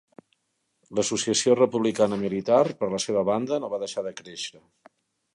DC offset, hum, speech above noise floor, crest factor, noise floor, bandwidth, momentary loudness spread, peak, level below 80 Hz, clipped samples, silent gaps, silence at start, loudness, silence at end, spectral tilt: under 0.1%; none; 51 dB; 18 dB; -75 dBFS; 11.5 kHz; 14 LU; -8 dBFS; -66 dBFS; under 0.1%; none; 0.9 s; -25 LUFS; 0.85 s; -4 dB/octave